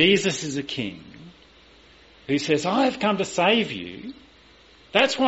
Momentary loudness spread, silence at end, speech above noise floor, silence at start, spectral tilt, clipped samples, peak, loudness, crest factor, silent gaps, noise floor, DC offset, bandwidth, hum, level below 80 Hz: 18 LU; 0 s; 30 dB; 0 s; -2.5 dB/octave; under 0.1%; -4 dBFS; -23 LUFS; 20 dB; none; -53 dBFS; under 0.1%; 8 kHz; none; -58 dBFS